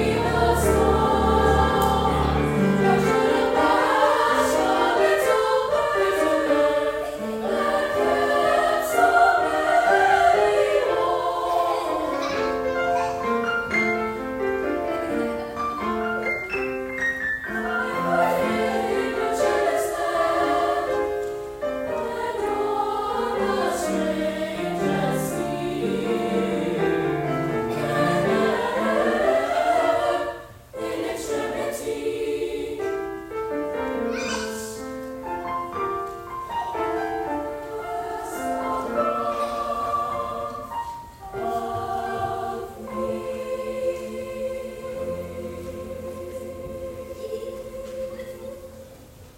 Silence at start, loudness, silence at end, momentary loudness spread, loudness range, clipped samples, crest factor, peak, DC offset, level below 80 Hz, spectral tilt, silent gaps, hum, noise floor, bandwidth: 0 s; -23 LUFS; 0.05 s; 13 LU; 10 LU; under 0.1%; 18 dB; -6 dBFS; under 0.1%; -42 dBFS; -5 dB/octave; none; none; -45 dBFS; 16.5 kHz